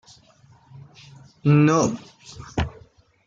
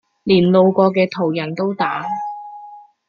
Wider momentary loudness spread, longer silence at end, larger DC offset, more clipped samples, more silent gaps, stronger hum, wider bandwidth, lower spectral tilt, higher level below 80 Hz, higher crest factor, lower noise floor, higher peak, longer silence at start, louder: first, 22 LU vs 18 LU; first, 0.55 s vs 0.3 s; neither; neither; neither; neither; first, 7.6 kHz vs 6.4 kHz; second, -6.5 dB/octave vs -8.5 dB/octave; first, -46 dBFS vs -58 dBFS; about the same, 18 dB vs 16 dB; first, -54 dBFS vs -40 dBFS; second, -6 dBFS vs -2 dBFS; first, 1.45 s vs 0.25 s; second, -21 LUFS vs -17 LUFS